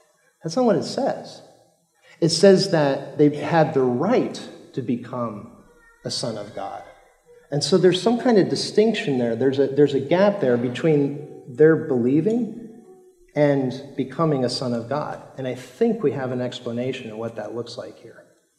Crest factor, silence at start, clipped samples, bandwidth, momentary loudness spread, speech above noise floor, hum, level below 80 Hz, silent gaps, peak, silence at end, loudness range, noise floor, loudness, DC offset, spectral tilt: 18 dB; 0.45 s; under 0.1%; 12 kHz; 15 LU; 38 dB; none; -68 dBFS; none; -4 dBFS; 0.45 s; 7 LU; -59 dBFS; -21 LUFS; under 0.1%; -6 dB/octave